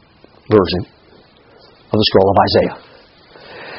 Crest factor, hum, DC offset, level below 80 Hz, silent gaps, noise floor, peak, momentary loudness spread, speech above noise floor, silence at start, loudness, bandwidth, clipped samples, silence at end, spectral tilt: 18 dB; none; under 0.1%; -44 dBFS; none; -47 dBFS; 0 dBFS; 23 LU; 34 dB; 0.5 s; -14 LUFS; 5.8 kHz; under 0.1%; 0 s; -4 dB/octave